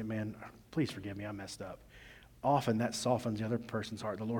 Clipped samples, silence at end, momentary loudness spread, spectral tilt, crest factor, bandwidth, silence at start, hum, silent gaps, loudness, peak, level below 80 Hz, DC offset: under 0.1%; 0 s; 19 LU; -6 dB/octave; 18 dB; 18.5 kHz; 0 s; none; none; -36 LUFS; -18 dBFS; -64 dBFS; under 0.1%